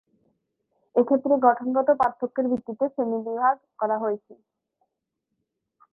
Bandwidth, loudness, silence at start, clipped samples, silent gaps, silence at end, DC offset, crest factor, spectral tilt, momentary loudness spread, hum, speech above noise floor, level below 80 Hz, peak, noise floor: 4 kHz; -24 LUFS; 0.95 s; under 0.1%; none; 1.6 s; under 0.1%; 22 dB; -9 dB/octave; 8 LU; none; 58 dB; -70 dBFS; -4 dBFS; -81 dBFS